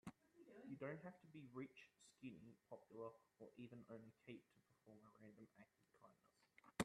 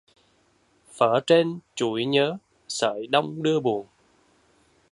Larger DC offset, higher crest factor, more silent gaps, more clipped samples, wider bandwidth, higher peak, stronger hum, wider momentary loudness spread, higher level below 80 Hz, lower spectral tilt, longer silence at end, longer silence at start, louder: neither; first, 28 dB vs 22 dB; neither; neither; about the same, 10.5 kHz vs 11.5 kHz; second, -30 dBFS vs -4 dBFS; neither; first, 13 LU vs 9 LU; second, -88 dBFS vs -72 dBFS; about the same, -5.5 dB/octave vs -4.5 dB/octave; second, 0 s vs 1.1 s; second, 0.05 s vs 0.95 s; second, -60 LUFS vs -24 LUFS